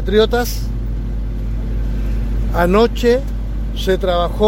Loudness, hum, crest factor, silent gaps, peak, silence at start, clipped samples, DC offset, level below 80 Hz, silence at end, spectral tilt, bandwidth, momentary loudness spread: -18 LUFS; none; 16 dB; none; 0 dBFS; 0 s; under 0.1%; under 0.1%; -20 dBFS; 0 s; -6 dB/octave; 16.5 kHz; 11 LU